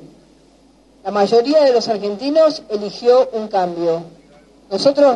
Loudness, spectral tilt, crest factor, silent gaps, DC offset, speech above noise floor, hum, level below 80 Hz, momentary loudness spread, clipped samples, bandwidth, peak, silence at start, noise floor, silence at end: -16 LUFS; -5 dB/octave; 16 dB; none; under 0.1%; 35 dB; none; -60 dBFS; 11 LU; under 0.1%; 10 kHz; 0 dBFS; 0 s; -50 dBFS; 0 s